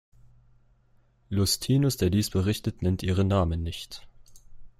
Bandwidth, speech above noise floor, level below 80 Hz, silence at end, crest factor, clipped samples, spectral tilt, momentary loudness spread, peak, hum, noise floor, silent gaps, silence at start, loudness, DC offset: 15.5 kHz; 37 dB; -48 dBFS; 0.1 s; 18 dB; under 0.1%; -5.5 dB/octave; 12 LU; -10 dBFS; none; -63 dBFS; none; 0.25 s; -26 LUFS; under 0.1%